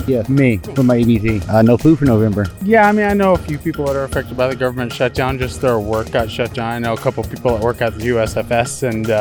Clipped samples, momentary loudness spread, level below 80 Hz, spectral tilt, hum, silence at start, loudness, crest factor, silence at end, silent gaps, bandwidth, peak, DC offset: under 0.1%; 8 LU; -36 dBFS; -6.5 dB/octave; none; 0 s; -16 LUFS; 14 dB; 0 s; none; 19.5 kHz; -2 dBFS; under 0.1%